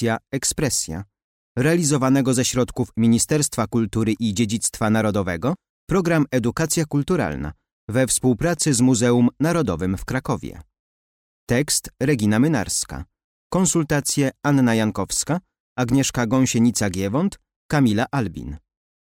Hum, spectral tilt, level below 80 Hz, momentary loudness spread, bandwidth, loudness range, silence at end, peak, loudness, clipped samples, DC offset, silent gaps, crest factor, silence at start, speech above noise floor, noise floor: none; -5 dB/octave; -44 dBFS; 9 LU; 17 kHz; 2 LU; 0.65 s; -8 dBFS; -21 LUFS; under 0.1%; under 0.1%; 1.24-1.55 s, 5.69-5.87 s, 7.73-7.88 s, 10.79-11.47 s, 13.24-13.50 s, 15.60-15.76 s, 17.56-17.69 s; 14 dB; 0 s; over 70 dB; under -90 dBFS